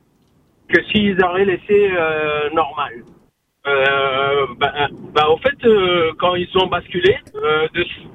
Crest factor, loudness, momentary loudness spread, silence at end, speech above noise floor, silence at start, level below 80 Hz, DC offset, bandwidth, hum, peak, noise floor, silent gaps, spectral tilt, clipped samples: 18 dB; -17 LUFS; 6 LU; 0.05 s; 40 dB; 0.7 s; -48 dBFS; under 0.1%; 6.2 kHz; none; 0 dBFS; -57 dBFS; none; -6.5 dB/octave; under 0.1%